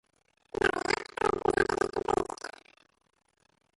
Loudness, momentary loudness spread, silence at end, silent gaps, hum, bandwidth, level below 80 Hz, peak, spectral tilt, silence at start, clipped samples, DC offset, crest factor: -30 LUFS; 13 LU; 1.3 s; none; none; 11.5 kHz; -54 dBFS; -12 dBFS; -4 dB/octave; 0.6 s; under 0.1%; under 0.1%; 20 dB